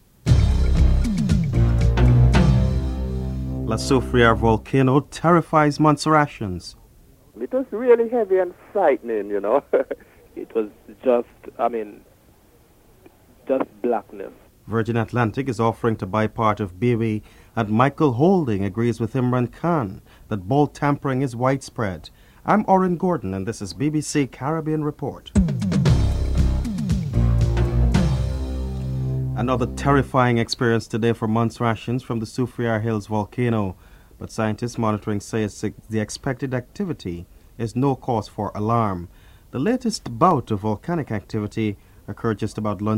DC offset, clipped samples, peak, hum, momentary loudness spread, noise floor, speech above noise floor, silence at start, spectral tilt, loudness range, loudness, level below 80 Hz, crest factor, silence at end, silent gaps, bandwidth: under 0.1%; under 0.1%; 0 dBFS; none; 11 LU; -54 dBFS; 32 dB; 0.25 s; -7 dB/octave; 7 LU; -22 LUFS; -30 dBFS; 20 dB; 0 s; none; 14 kHz